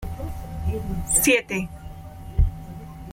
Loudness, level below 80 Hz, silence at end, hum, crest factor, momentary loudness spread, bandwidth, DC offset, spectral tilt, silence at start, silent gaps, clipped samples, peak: -23 LUFS; -30 dBFS; 0 s; none; 20 dB; 21 LU; 16.5 kHz; under 0.1%; -4 dB/octave; 0 s; none; under 0.1%; -6 dBFS